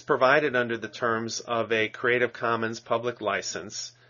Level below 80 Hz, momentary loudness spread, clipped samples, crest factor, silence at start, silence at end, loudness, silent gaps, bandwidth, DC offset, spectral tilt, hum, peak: -72 dBFS; 9 LU; under 0.1%; 20 dB; 0.1 s; 0.2 s; -26 LUFS; none; 7.2 kHz; under 0.1%; -2.5 dB/octave; none; -8 dBFS